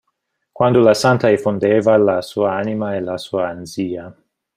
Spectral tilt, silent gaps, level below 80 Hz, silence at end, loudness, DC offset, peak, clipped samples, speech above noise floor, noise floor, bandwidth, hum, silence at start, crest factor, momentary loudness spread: -6 dB/octave; none; -58 dBFS; 0.45 s; -17 LUFS; under 0.1%; -2 dBFS; under 0.1%; 56 dB; -72 dBFS; 15.5 kHz; none; 0.55 s; 16 dB; 12 LU